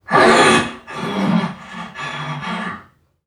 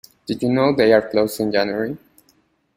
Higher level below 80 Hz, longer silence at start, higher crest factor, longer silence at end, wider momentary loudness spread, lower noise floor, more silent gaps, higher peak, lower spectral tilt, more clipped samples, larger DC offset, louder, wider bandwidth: about the same, -52 dBFS vs -56 dBFS; second, 0.1 s vs 0.3 s; about the same, 18 dB vs 18 dB; second, 0.45 s vs 0.8 s; first, 19 LU vs 13 LU; second, -45 dBFS vs -61 dBFS; neither; about the same, 0 dBFS vs -2 dBFS; second, -4.5 dB/octave vs -6 dB/octave; neither; neither; about the same, -17 LUFS vs -19 LUFS; about the same, 15 kHz vs 16 kHz